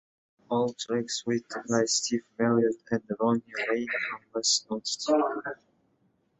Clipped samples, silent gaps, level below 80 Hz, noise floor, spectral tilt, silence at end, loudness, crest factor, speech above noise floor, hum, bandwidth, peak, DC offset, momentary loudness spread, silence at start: under 0.1%; none; -72 dBFS; -70 dBFS; -3 dB/octave; 0.85 s; -28 LUFS; 20 dB; 42 dB; none; 8.4 kHz; -10 dBFS; under 0.1%; 7 LU; 0.5 s